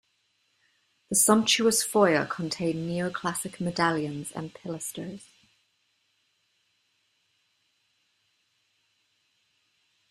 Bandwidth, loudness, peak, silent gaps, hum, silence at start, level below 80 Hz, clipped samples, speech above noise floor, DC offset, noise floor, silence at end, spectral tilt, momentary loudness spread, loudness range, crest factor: 15 kHz; -26 LUFS; -6 dBFS; none; none; 1.1 s; -68 dBFS; under 0.1%; 46 dB; under 0.1%; -73 dBFS; 4.9 s; -3 dB/octave; 17 LU; 18 LU; 24 dB